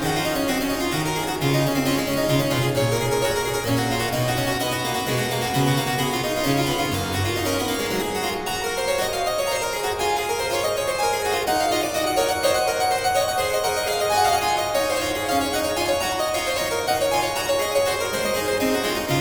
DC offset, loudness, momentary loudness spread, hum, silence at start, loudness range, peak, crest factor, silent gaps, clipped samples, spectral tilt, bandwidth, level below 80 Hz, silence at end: under 0.1%; -22 LUFS; 3 LU; none; 0 s; 2 LU; -8 dBFS; 14 dB; none; under 0.1%; -4 dB/octave; over 20 kHz; -44 dBFS; 0 s